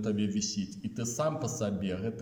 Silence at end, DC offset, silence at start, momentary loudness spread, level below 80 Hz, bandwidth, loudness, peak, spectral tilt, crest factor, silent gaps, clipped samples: 0 s; under 0.1%; 0 s; 5 LU; -64 dBFS; 17.5 kHz; -33 LUFS; -20 dBFS; -5 dB/octave; 14 dB; none; under 0.1%